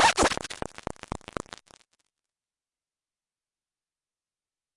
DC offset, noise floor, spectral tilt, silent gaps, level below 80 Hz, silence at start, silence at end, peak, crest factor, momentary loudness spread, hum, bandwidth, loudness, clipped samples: under 0.1%; under -90 dBFS; -2 dB/octave; none; -52 dBFS; 0 s; 3.6 s; -8 dBFS; 24 dB; 18 LU; none; 11.5 kHz; -30 LUFS; under 0.1%